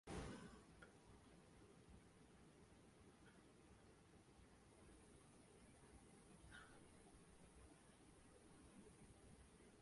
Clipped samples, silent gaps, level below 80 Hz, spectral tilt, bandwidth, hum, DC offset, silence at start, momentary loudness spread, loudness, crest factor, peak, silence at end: under 0.1%; none; -72 dBFS; -5 dB/octave; 11.5 kHz; none; under 0.1%; 0.05 s; 6 LU; -66 LUFS; 24 dB; -40 dBFS; 0 s